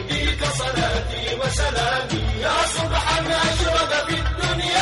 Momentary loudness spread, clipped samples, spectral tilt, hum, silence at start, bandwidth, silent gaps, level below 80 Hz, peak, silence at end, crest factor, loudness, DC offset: 4 LU; under 0.1%; -3.5 dB/octave; none; 0 s; 11.5 kHz; none; -30 dBFS; -6 dBFS; 0 s; 16 dB; -21 LUFS; under 0.1%